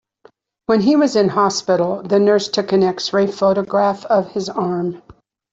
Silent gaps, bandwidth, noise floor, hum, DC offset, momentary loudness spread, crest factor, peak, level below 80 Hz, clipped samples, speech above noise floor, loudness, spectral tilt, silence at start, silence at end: none; 8 kHz; -52 dBFS; none; under 0.1%; 8 LU; 14 dB; -2 dBFS; -58 dBFS; under 0.1%; 36 dB; -17 LUFS; -5.5 dB/octave; 0.7 s; 0.4 s